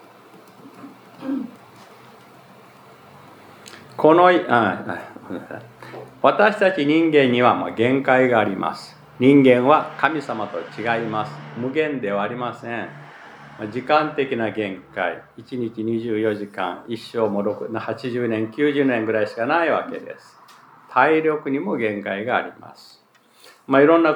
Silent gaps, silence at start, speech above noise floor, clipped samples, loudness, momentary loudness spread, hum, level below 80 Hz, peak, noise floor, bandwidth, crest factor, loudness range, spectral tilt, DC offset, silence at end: none; 0.35 s; 34 dB; under 0.1%; -20 LUFS; 20 LU; none; -70 dBFS; 0 dBFS; -54 dBFS; 18.5 kHz; 20 dB; 8 LU; -7 dB/octave; under 0.1%; 0 s